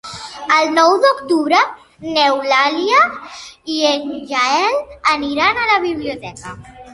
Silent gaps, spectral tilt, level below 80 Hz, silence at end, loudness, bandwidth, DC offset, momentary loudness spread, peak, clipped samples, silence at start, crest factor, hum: none; -2.5 dB/octave; -52 dBFS; 0 s; -15 LUFS; 11.5 kHz; under 0.1%; 18 LU; 0 dBFS; under 0.1%; 0.05 s; 16 dB; none